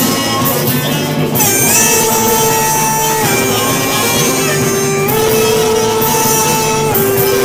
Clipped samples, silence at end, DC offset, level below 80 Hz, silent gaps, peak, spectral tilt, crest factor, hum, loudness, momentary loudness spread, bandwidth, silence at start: under 0.1%; 0 s; under 0.1%; -40 dBFS; none; 0 dBFS; -3 dB/octave; 12 dB; none; -11 LUFS; 4 LU; over 20 kHz; 0 s